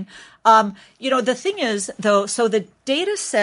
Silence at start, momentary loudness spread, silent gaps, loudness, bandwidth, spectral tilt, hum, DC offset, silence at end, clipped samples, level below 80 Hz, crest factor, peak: 0 s; 9 LU; none; -19 LUFS; 11.5 kHz; -3 dB/octave; none; under 0.1%; 0 s; under 0.1%; -70 dBFS; 18 dB; -2 dBFS